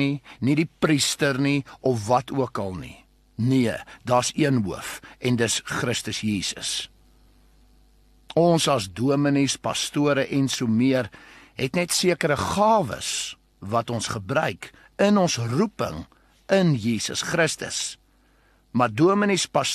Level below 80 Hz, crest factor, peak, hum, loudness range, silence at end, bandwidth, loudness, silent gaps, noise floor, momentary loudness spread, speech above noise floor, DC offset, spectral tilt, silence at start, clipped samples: -54 dBFS; 18 dB; -6 dBFS; none; 3 LU; 0 s; 13 kHz; -23 LUFS; none; -60 dBFS; 10 LU; 37 dB; under 0.1%; -4.5 dB/octave; 0 s; under 0.1%